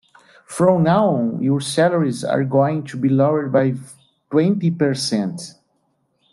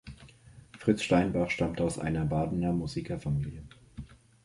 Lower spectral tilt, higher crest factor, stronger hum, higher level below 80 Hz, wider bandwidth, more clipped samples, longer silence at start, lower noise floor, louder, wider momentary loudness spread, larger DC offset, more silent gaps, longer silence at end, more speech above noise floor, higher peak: about the same, -6.5 dB/octave vs -6.5 dB/octave; about the same, 16 dB vs 20 dB; neither; second, -62 dBFS vs -48 dBFS; about the same, 12.5 kHz vs 11.5 kHz; neither; first, 0.5 s vs 0.05 s; first, -66 dBFS vs -54 dBFS; first, -18 LUFS vs -30 LUFS; second, 7 LU vs 22 LU; neither; neither; first, 0.85 s vs 0.3 s; first, 49 dB vs 25 dB; first, -2 dBFS vs -12 dBFS